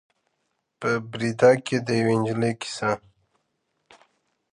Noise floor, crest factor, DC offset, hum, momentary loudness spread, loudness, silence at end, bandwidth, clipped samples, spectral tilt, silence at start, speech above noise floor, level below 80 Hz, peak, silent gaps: -76 dBFS; 22 dB; under 0.1%; none; 10 LU; -24 LUFS; 1.55 s; 11 kHz; under 0.1%; -6 dB/octave; 0.8 s; 53 dB; -66 dBFS; -4 dBFS; none